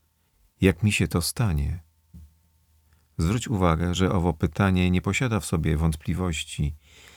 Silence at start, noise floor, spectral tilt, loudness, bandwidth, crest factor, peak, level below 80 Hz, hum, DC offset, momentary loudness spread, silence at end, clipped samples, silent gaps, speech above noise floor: 0.6 s; -65 dBFS; -5.5 dB/octave; -25 LUFS; 19 kHz; 20 dB; -4 dBFS; -36 dBFS; none; under 0.1%; 8 LU; 0.4 s; under 0.1%; none; 41 dB